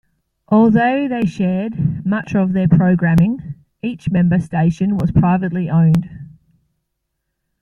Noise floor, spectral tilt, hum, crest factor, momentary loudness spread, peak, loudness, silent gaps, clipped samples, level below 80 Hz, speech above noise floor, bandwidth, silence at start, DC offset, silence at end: -74 dBFS; -9.5 dB/octave; none; 14 dB; 8 LU; -2 dBFS; -16 LUFS; none; under 0.1%; -42 dBFS; 59 dB; 6.8 kHz; 0.5 s; under 0.1%; 1.35 s